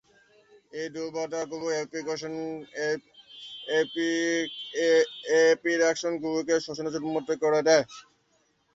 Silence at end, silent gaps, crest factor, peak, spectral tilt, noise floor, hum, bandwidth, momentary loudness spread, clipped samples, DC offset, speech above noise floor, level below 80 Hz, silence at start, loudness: 0.75 s; none; 20 dB; -8 dBFS; -3.5 dB/octave; -69 dBFS; none; 7.8 kHz; 14 LU; under 0.1%; under 0.1%; 42 dB; -74 dBFS; 0.75 s; -27 LUFS